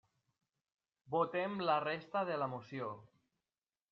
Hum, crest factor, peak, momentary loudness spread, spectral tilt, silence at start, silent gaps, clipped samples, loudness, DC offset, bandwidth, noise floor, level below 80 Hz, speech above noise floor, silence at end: none; 20 dB; -20 dBFS; 10 LU; -4 dB/octave; 1.1 s; none; under 0.1%; -38 LUFS; under 0.1%; 6.4 kHz; under -90 dBFS; -84 dBFS; over 52 dB; 0.85 s